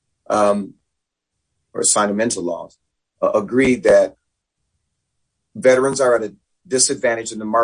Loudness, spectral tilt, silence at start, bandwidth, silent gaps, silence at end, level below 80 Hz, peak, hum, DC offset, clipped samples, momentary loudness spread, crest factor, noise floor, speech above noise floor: -17 LUFS; -3 dB/octave; 0.3 s; 10.5 kHz; none; 0 s; -54 dBFS; -2 dBFS; none; under 0.1%; under 0.1%; 10 LU; 18 dB; -78 dBFS; 61 dB